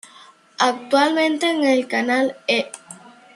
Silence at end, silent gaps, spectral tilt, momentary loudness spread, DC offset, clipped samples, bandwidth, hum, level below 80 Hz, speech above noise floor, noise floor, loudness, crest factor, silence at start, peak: 0.4 s; none; -2.5 dB/octave; 4 LU; under 0.1%; under 0.1%; 12.5 kHz; none; -74 dBFS; 29 dB; -48 dBFS; -19 LUFS; 18 dB; 0.6 s; -2 dBFS